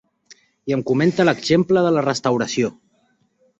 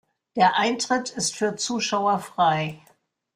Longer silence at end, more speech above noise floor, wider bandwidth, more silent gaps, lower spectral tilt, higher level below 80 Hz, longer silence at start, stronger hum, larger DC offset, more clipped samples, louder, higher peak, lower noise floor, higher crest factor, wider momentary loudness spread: first, 0.9 s vs 0.6 s; first, 45 dB vs 39 dB; second, 8.2 kHz vs 15.5 kHz; neither; first, -5.5 dB/octave vs -3 dB/octave; first, -58 dBFS vs -66 dBFS; about the same, 0.3 s vs 0.35 s; neither; neither; neither; first, -19 LUFS vs -23 LUFS; about the same, -4 dBFS vs -6 dBFS; about the same, -63 dBFS vs -62 dBFS; about the same, 16 dB vs 18 dB; about the same, 8 LU vs 7 LU